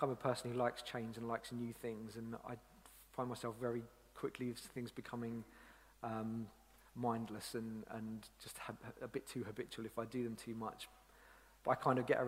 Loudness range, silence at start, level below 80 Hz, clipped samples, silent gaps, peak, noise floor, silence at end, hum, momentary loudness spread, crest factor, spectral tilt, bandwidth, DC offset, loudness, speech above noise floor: 3 LU; 0 s; -70 dBFS; under 0.1%; none; -22 dBFS; -65 dBFS; 0 s; none; 15 LU; 22 dB; -5.5 dB/octave; 16 kHz; under 0.1%; -45 LUFS; 22 dB